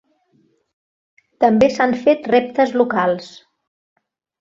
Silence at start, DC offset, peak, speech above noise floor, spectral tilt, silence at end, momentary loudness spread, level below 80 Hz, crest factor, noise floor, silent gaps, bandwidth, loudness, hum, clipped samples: 1.4 s; under 0.1%; -2 dBFS; 45 dB; -6 dB/octave; 1.1 s; 5 LU; -58 dBFS; 18 dB; -61 dBFS; none; 7.6 kHz; -16 LUFS; none; under 0.1%